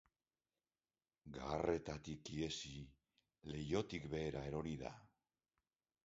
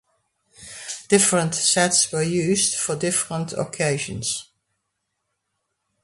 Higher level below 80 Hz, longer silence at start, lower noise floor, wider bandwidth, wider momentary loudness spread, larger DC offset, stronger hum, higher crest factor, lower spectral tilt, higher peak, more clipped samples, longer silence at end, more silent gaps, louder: about the same, -64 dBFS vs -60 dBFS; first, 1.25 s vs 0.6 s; first, under -90 dBFS vs -77 dBFS; second, 7.6 kHz vs 12 kHz; about the same, 16 LU vs 14 LU; neither; neither; about the same, 22 dB vs 22 dB; first, -5 dB/octave vs -3 dB/octave; second, -24 dBFS vs -2 dBFS; neither; second, 1 s vs 1.6 s; neither; second, -45 LUFS vs -20 LUFS